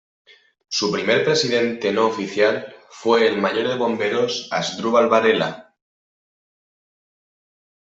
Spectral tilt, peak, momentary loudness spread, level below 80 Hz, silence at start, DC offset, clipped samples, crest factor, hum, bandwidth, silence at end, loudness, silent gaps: -4 dB/octave; -2 dBFS; 9 LU; -66 dBFS; 0.7 s; under 0.1%; under 0.1%; 20 dB; none; 8 kHz; 2.35 s; -20 LUFS; none